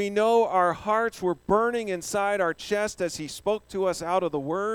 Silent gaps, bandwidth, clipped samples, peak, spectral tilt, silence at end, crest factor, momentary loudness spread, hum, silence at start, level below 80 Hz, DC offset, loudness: none; 17.5 kHz; under 0.1%; -8 dBFS; -4.5 dB/octave; 0 s; 18 dB; 8 LU; none; 0 s; -56 dBFS; under 0.1%; -26 LUFS